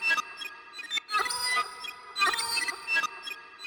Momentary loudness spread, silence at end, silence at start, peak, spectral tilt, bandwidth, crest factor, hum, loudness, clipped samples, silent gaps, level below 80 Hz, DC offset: 13 LU; 0 s; 0 s; -14 dBFS; 1.5 dB/octave; 19 kHz; 18 dB; none; -29 LUFS; under 0.1%; none; -72 dBFS; under 0.1%